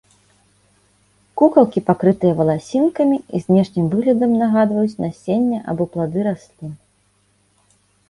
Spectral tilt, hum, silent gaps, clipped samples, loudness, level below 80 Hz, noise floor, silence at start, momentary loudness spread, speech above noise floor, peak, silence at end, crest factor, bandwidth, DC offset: -9 dB/octave; 50 Hz at -45 dBFS; none; under 0.1%; -17 LUFS; -56 dBFS; -61 dBFS; 1.35 s; 10 LU; 44 dB; 0 dBFS; 1.35 s; 18 dB; 11.5 kHz; under 0.1%